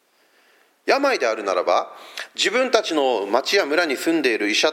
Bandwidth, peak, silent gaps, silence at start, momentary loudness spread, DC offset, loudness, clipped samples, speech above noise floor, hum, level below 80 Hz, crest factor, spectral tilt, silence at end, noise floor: 16.5 kHz; 0 dBFS; none; 0.85 s; 6 LU; under 0.1%; -20 LUFS; under 0.1%; 39 dB; none; -82 dBFS; 20 dB; -1.5 dB/octave; 0 s; -59 dBFS